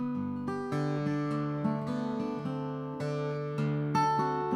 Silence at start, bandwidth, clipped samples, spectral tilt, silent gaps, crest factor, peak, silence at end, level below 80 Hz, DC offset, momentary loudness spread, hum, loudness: 0 s; 10.5 kHz; under 0.1%; -7.5 dB/octave; none; 14 dB; -16 dBFS; 0 s; -66 dBFS; under 0.1%; 7 LU; none; -32 LUFS